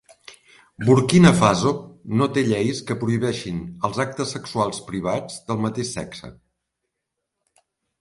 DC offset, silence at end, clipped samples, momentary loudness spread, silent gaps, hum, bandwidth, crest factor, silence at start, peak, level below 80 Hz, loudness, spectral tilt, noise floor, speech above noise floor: under 0.1%; 1.7 s; under 0.1%; 14 LU; none; none; 11.5 kHz; 22 dB; 0.3 s; 0 dBFS; -50 dBFS; -21 LUFS; -6 dB/octave; -81 dBFS; 60 dB